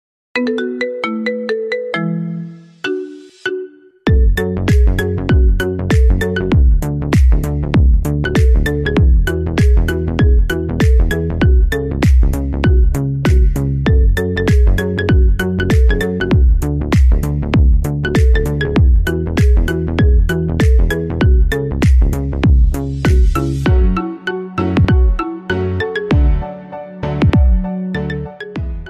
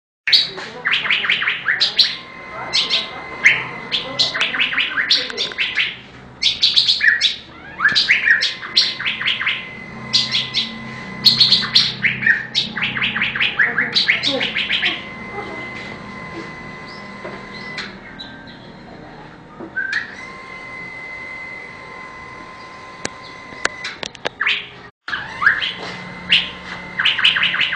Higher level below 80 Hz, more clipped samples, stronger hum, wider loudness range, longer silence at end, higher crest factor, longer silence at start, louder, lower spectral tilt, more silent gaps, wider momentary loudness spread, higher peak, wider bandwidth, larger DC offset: first, -14 dBFS vs -52 dBFS; neither; neither; second, 3 LU vs 15 LU; about the same, 0 s vs 0 s; second, 10 dB vs 20 dB; about the same, 0.35 s vs 0.25 s; about the same, -15 LUFS vs -16 LUFS; first, -7.5 dB/octave vs -1.5 dB/octave; second, none vs 24.91-25.01 s; second, 9 LU vs 20 LU; about the same, -2 dBFS vs 0 dBFS; about the same, 14 kHz vs 13 kHz; neither